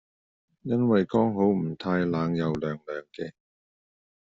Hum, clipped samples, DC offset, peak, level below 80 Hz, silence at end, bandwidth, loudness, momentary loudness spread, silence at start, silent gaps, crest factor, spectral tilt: none; under 0.1%; under 0.1%; -10 dBFS; -62 dBFS; 0.9 s; 7.4 kHz; -26 LUFS; 16 LU; 0.65 s; none; 18 dB; -7 dB/octave